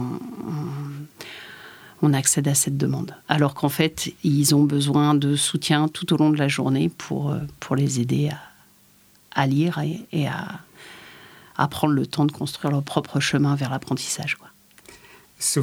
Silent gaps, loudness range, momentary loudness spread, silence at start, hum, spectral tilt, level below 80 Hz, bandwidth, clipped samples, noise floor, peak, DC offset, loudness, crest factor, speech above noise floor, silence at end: none; 6 LU; 17 LU; 0 s; none; -4.5 dB/octave; -60 dBFS; 17 kHz; under 0.1%; -55 dBFS; -2 dBFS; under 0.1%; -22 LUFS; 22 dB; 34 dB; 0 s